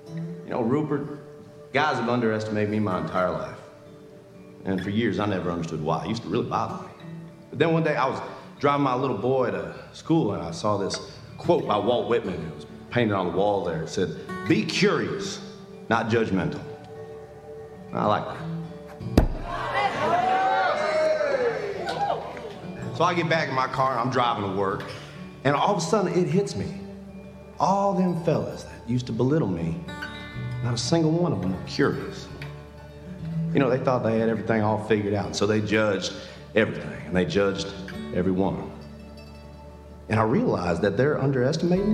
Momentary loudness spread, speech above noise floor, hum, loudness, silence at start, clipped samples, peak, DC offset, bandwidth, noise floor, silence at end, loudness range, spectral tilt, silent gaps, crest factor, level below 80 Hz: 18 LU; 22 dB; none; -25 LUFS; 0 s; under 0.1%; -4 dBFS; under 0.1%; 13 kHz; -46 dBFS; 0 s; 4 LU; -6 dB/octave; none; 22 dB; -44 dBFS